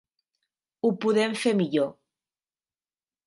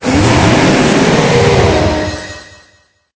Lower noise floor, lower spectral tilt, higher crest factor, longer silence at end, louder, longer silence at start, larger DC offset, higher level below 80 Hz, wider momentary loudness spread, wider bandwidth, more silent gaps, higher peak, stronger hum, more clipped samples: first, under -90 dBFS vs -51 dBFS; about the same, -5.5 dB/octave vs -5.5 dB/octave; first, 18 dB vs 10 dB; first, 1.35 s vs 0.75 s; second, -25 LUFS vs -10 LUFS; first, 0.85 s vs 0 s; neither; second, -78 dBFS vs -26 dBFS; second, 5 LU vs 14 LU; first, 11.5 kHz vs 8 kHz; neither; second, -12 dBFS vs 0 dBFS; neither; neither